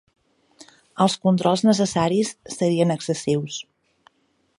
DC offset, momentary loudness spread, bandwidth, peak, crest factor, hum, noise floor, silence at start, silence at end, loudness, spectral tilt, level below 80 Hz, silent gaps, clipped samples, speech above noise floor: under 0.1%; 10 LU; 11.5 kHz; -4 dBFS; 20 dB; none; -64 dBFS; 0.95 s; 0.95 s; -21 LUFS; -5.5 dB/octave; -62 dBFS; none; under 0.1%; 43 dB